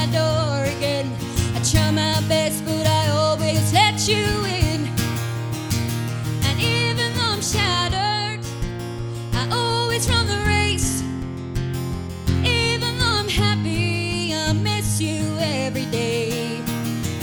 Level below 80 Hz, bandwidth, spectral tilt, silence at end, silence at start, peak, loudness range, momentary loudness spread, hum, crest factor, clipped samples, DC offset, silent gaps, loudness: -38 dBFS; over 20 kHz; -4.5 dB/octave; 0 s; 0 s; -4 dBFS; 3 LU; 8 LU; none; 18 dB; under 0.1%; under 0.1%; none; -21 LUFS